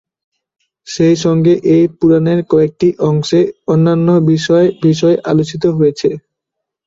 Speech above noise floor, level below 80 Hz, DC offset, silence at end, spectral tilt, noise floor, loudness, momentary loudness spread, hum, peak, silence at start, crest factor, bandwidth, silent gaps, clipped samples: 67 dB; -52 dBFS; under 0.1%; 0.7 s; -7 dB/octave; -78 dBFS; -12 LUFS; 4 LU; none; -2 dBFS; 0.85 s; 12 dB; 7.8 kHz; none; under 0.1%